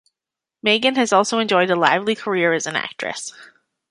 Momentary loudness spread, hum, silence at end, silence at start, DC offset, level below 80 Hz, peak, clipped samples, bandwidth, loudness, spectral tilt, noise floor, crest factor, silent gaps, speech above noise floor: 11 LU; none; 0.45 s; 0.65 s; under 0.1%; -70 dBFS; -2 dBFS; under 0.1%; 11.5 kHz; -18 LUFS; -3 dB/octave; -87 dBFS; 18 dB; none; 68 dB